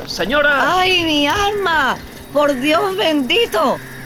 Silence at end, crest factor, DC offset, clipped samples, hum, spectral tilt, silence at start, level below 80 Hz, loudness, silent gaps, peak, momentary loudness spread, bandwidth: 0 s; 12 dB; under 0.1%; under 0.1%; none; -3.5 dB/octave; 0 s; -40 dBFS; -15 LUFS; none; -6 dBFS; 5 LU; 19 kHz